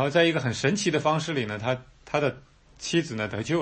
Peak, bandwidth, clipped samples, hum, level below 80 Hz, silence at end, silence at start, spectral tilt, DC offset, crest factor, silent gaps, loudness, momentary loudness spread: -8 dBFS; 8.8 kHz; under 0.1%; none; -58 dBFS; 0 s; 0 s; -5 dB/octave; under 0.1%; 18 dB; none; -26 LUFS; 8 LU